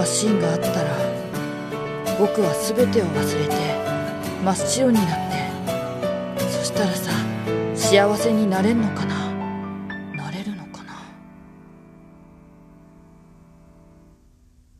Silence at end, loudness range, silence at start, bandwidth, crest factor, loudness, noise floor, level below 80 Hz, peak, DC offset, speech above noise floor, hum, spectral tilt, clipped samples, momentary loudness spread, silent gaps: 2.05 s; 13 LU; 0 s; 14 kHz; 20 dB; -22 LUFS; -54 dBFS; -54 dBFS; -4 dBFS; under 0.1%; 34 dB; none; -5 dB/octave; under 0.1%; 12 LU; none